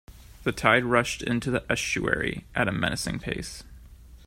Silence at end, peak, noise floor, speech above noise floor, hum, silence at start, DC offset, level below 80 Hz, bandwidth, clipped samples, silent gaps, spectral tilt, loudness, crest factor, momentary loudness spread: 0 s; -4 dBFS; -48 dBFS; 21 dB; none; 0.1 s; under 0.1%; -46 dBFS; 16 kHz; under 0.1%; none; -4.5 dB/octave; -26 LUFS; 24 dB; 11 LU